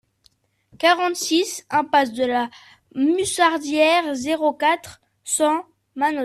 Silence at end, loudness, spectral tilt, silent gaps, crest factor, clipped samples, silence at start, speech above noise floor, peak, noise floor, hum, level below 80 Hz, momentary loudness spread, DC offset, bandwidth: 0 s; -20 LUFS; -2 dB/octave; none; 16 dB; under 0.1%; 0.8 s; 42 dB; -6 dBFS; -62 dBFS; none; -64 dBFS; 8 LU; under 0.1%; 14 kHz